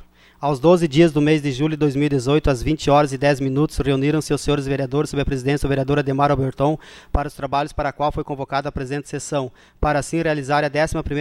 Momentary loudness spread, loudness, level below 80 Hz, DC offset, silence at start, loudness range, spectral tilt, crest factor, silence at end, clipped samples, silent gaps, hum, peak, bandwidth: 10 LU; -20 LUFS; -34 dBFS; under 0.1%; 0 s; 6 LU; -6.5 dB/octave; 16 dB; 0 s; under 0.1%; none; none; -4 dBFS; 13 kHz